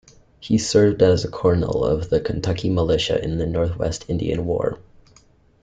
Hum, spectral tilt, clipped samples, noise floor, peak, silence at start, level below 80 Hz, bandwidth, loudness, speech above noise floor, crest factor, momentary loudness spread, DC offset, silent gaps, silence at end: none; -6 dB/octave; under 0.1%; -54 dBFS; -4 dBFS; 0.4 s; -40 dBFS; 9.4 kHz; -21 LUFS; 35 dB; 16 dB; 8 LU; under 0.1%; none; 0.85 s